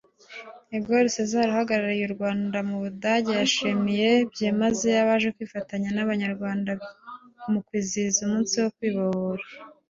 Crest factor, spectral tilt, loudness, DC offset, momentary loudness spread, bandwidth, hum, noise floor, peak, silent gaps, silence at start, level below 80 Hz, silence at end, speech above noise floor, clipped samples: 16 dB; -4 dB/octave; -25 LUFS; under 0.1%; 15 LU; 7.6 kHz; none; -44 dBFS; -8 dBFS; none; 0.3 s; -64 dBFS; 0.2 s; 20 dB; under 0.1%